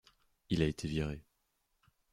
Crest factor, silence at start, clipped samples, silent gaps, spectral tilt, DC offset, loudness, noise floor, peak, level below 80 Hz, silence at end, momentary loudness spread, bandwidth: 24 dB; 0.5 s; under 0.1%; none; -6.5 dB/octave; under 0.1%; -36 LUFS; -80 dBFS; -16 dBFS; -52 dBFS; 0.9 s; 8 LU; 13 kHz